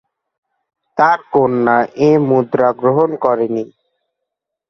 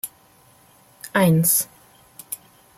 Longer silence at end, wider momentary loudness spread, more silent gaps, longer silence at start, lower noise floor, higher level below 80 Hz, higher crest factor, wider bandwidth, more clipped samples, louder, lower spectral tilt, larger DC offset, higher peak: first, 1.05 s vs 0.45 s; second, 7 LU vs 18 LU; neither; first, 0.95 s vs 0.05 s; first, -79 dBFS vs -54 dBFS; about the same, -60 dBFS vs -62 dBFS; about the same, 16 dB vs 18 dB; second, 6.4 kHz vs 16 kHz; neither; first, -14 LUFS vs -19 LUFS; first, -8.5 dB/octave vs -4.5 dB/octave; neither; first, 0 dBFS vs -6 dBFS